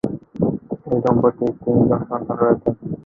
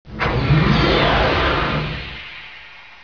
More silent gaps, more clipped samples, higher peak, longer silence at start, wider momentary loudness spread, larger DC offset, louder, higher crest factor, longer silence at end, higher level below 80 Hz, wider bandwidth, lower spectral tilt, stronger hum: neither; neither; about the same, -2 dBFS vs -4 dBFS; about the same, 0.05 s vs 0.05 s; second, 8 LU vs 19 LU; second, under 0.1% vs 0.4%; second, -20 LUFS vs -17 LUFS; about the same, 18 dB vs 16 dB; second, 0.05 s vs 0.2 s; second, -46 dBFS vs -28 dBFS; about the same, 5.4 kHz vs 5.4 kHz; first, -11 dB/octave vs -7 dB/octave; neither